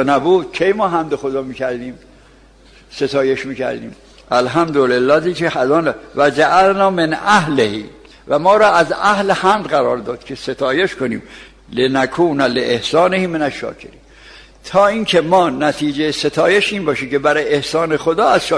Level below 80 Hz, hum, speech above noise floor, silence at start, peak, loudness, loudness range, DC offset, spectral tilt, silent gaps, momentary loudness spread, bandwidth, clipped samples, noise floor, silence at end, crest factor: -48 dBFS; none; 31 dB; 0 s; -2 dBFS; -15 LUFS; 5 LU; under 0.1%; -5 dB/octave; none; 10 LU; 11 kHz; under 0.1%; -45 dBFS; 0 s; 14 dB